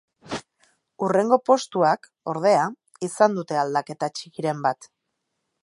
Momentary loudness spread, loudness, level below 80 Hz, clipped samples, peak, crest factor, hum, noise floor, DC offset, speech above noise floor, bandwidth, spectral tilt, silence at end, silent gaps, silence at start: 15 LU; -23 LUFS; -70 dBFS; under 0.1%; -4 dBFS; 20 dB; none; -78 dBFS; under 0.1%; 56 dB; 11.5 kHz; -5 dB/octave; 0.8 s; none; 0.25 s